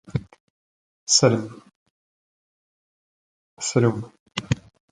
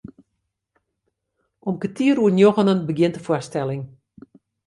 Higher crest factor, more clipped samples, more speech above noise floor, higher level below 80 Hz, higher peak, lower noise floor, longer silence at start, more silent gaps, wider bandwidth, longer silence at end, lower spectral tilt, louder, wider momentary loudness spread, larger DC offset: first, 24 dB vs 18 dB; neither; first, over 70 dB vs 58 dB; first, -52 dBFS vs -62 dBFS; about the same, -2 dBFS vs -4 dBFS; first, under -90 dBFS vs -77 dBFS; second, 0.1 s vs 1.65 s; first, 0.40-1.07 s, 1.76-3.57 s, 4.20-4.26 s vs none; about the same, 11 kHz vs 11.5 kHz; second, 0.35 s vs 0.8 s; second, -4 dB/octave vs -7 dB/octave; about the same, -22 LUFS vs -20 LUFS; about the same, 17 LU vs 15 LU; neither